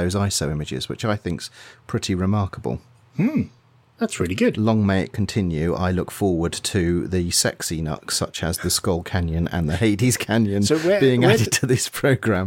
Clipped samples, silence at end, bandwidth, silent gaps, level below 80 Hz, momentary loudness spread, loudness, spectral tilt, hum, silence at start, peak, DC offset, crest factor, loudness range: under 0.1%; 0 s; 17 kHz; none; -42 dBFS; 9 LU; -21 LUFS; -5 dB/octave; none; 0 s; -4 dBFS; under 0.1%; 18 dB; 6 LU